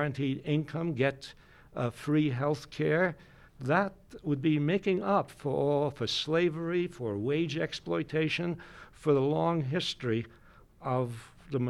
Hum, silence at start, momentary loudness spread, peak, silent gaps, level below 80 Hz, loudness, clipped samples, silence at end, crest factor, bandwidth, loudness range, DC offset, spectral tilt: none; 0 s; 10 LU; -12 dBFS; none; -60 dBFS; -31 LUFS; under 0.1%; 0 s; 20 dB; 12.5 kHz; 2 LU; under 0.1%; -6.5 dB/octave